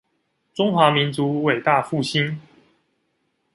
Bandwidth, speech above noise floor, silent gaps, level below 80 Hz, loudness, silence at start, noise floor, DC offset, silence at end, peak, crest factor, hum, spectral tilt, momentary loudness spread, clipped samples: 11.5 kHz; 51 dB; none; -64 dBFS; -20 LUFS; 0.55 s; -71 dBFS; under 0.1%; 1.15 s; -2 dBFS; 20 dB; none; -6 dB/octave; 10 LU; under 0.1%